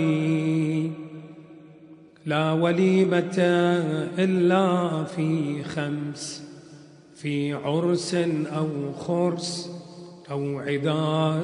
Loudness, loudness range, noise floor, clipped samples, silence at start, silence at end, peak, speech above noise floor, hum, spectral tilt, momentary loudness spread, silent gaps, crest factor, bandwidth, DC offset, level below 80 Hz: -25 LUFS; 6 LU; -49 dBFS; under 0.1%; 0 s; 0 s; -6 dBFS; 25 dB; none; -6.5 dB/octave; 17 LU; none; 18 dB; 10.5 kHz; under 0.1%; -68 dBFS